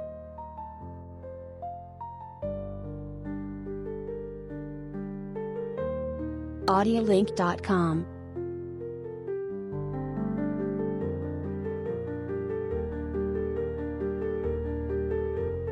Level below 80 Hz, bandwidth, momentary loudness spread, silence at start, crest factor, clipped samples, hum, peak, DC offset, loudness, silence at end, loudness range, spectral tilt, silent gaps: -46 dBFS; 11 kHz; 15 LU; 0 s; 20 dB; under 0.1%; none; -12 dBFS; under 0.1%; -32 LUFS; 0 s; 10 LU; -8 dB/octave; none